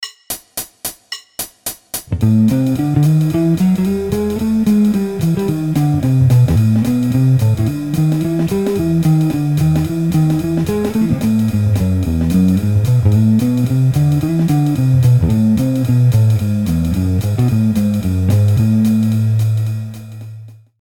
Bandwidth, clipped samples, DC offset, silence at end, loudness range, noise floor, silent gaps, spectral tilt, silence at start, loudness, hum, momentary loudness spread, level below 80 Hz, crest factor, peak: 17.5 kHz; under 0.1%; under 0.1%; 0.3 s; 2 LU; -34 dBFS; none; -7.5 dB/octave; 0 s; -14 LUFS; none; 11 LU; -34 dBFS; 12 dB; -2 dBFS